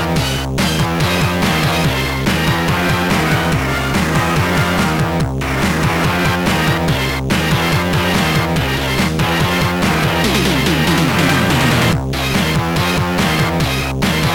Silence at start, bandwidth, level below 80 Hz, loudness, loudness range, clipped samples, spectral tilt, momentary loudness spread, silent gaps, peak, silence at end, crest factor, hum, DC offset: 0 s; 19 kHz; -28 dBFS; -15 LUFS; 1 LU; under 0.1%; -5 dB/octave; 3 LU; none; -4 dBFS; 0 s; 12 dB; none; under 0.1%